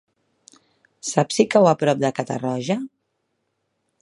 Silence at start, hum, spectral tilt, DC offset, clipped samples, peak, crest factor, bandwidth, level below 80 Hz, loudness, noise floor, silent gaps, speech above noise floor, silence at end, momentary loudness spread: 1.05 s; none; -5 dB/octave; under 0.1%; under 0.1%; -2 dBFS; 22 dB; 11.5 kHz; -68 dBFS; -20 LUFS; -74 dBFS; none; 54 dB; 1.15 s; 11 LU